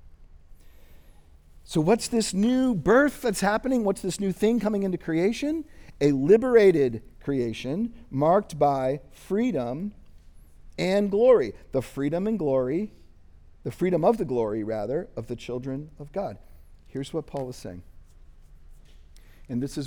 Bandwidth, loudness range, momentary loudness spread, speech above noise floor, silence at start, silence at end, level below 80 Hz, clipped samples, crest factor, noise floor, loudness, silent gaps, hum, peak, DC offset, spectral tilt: over 20 kHz; 12 LU; 16 LU; 27 dB; 0.05 s; 0 s; -50 dBFS; under 0.1%; 20 dB; -51 dBFS; -25 LUFS; none; none; -6 dBFS; under 0.1%; -6 dB/octave